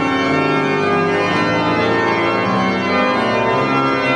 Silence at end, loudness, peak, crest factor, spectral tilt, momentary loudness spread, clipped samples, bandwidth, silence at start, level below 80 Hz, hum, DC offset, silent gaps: 0 s; -16 LUFS; -4 dBFS; 12 dB; -6 dB/octave; 1 LU; under 0.1%; 10.5 kHz; 0 s; -52 dBFS; none; under 0.1%; none